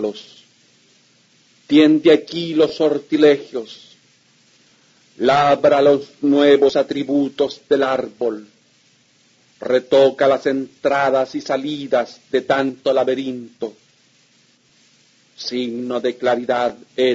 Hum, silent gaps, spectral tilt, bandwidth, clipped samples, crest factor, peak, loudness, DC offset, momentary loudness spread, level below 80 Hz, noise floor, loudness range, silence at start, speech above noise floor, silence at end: none; none; -5.5 dB/octave; 7.8 kHz; under 0.1%; 18 dB; -2 dBFS; -17 LUFS; under 0.1%; 13 LU; -64 dBFS; -56 dBFS; 8 LU; 0 s; 39 dB; 0 s